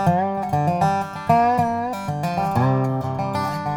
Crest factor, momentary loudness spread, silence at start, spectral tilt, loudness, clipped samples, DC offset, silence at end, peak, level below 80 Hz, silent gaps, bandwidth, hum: 18 dB; 7 LU; 0 s; -7.5 dB/octave; -21 LUFS; under 0.1%; under 0.1%; 0 s; -4 dBFS; -52 dBFS; none; 19 kHz; none